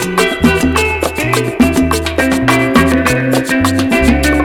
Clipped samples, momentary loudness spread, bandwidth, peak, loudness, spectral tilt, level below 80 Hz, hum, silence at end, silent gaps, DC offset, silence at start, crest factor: under 0.1%; 4 LU; 20 kHz; 0 dBFS; -12 LUFS; -5 dB/octave; -24 dBFS; none; 0 s; none; under 0.1%; 0 s; 10 dB